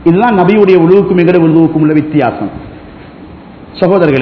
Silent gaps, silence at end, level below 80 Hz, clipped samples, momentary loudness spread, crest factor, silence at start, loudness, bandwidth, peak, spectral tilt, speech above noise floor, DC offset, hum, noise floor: none; 0 s; -40 dBFS; 2%; 14 LU; 8 dB; 0 s; -8 LUFS; 5.4 kHz; 0 dBFS; -10.5 dB/octave; 24 dB; under 0.1%; none; -31 dBFS